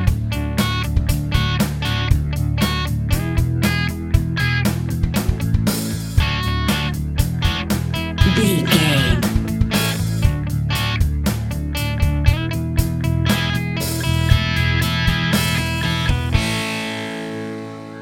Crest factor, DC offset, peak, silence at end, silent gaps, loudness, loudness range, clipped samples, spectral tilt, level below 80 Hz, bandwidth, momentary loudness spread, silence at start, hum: 18 dB; under 0.1%; 0 dBFS; 0 s; none; -19 LUFS; 2 LU; under 0.1%; -5 dB/octave; -26 dBFS; 17 kHz; 6 LU; 0 s; none